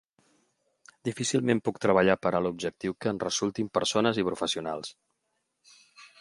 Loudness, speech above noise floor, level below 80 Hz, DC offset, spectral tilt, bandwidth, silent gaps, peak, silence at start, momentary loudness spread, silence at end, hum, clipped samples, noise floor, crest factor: -28 LUFS; 51 dB; -62 dBFS; under 0.1%; -4.5 dB/octave; 11.5 kHz; none; -8 dBFS; 1.05 s; 12 LU; 0.15 s; none; under 0.1%; -79 dBFS; 22 dB